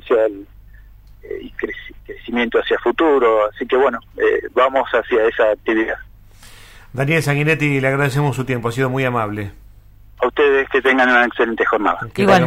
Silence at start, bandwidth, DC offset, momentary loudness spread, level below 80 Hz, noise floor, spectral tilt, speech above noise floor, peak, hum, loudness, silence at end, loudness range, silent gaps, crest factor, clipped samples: 0.05 s; 16 kHz; under 0.1%; 14 LU; -44 dBFS; -43 dBFS; -6 dB/octave; 26 dB; -2 dBFS; none; -17 LUFS; 0 s; 3 LU; none; 14 dB; under 0.1%